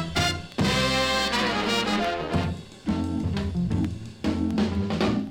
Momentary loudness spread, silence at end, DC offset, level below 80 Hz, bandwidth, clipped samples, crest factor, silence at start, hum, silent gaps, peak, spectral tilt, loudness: 7 LU; 0 s; under 0.1%; -42 dBFS; 17.5 kHz; under 0.1%; 16 dB; 0 s; none; none; -10 dBFS; -5 dB/octave; -25 LUFS